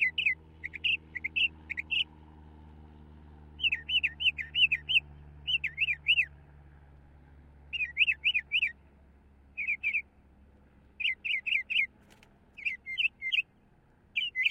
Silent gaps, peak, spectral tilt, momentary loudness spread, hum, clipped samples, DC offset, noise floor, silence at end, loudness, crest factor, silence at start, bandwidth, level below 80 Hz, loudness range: none; -14 dBFS; -2 dB/octave; 10 LU; none; under 0.1%; under 0.1%; -63 dBFS; 0 s; -29 LUFS; 20 dB; 0 s; 16 kHz; -58 dBFS; 5 LU